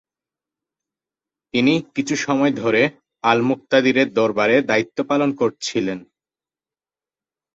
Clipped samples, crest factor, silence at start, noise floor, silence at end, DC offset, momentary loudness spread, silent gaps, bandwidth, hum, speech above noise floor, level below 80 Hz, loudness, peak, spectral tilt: under 0.1%; 20 dB; 1.55 s; under -90 dBFS; 1.55 s; under 0.1%; 7 LU; none; 8 kHz; none; over 72 dB; -62 dBFS; -19 LUFS; -2 dBFS; -5 dB/octave